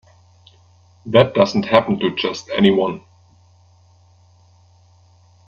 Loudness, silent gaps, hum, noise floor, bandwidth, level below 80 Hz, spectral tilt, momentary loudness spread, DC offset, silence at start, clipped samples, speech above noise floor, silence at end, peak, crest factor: -17 LUFS; none; none; -52 dBFS; 7.2 kHz; -56 dBFS; -6 dB/octave; 9 LU; under 0.1%; 1.05 s; under 0.1%; 36 dB; 2.5 s; 0 dBFS; 20 dB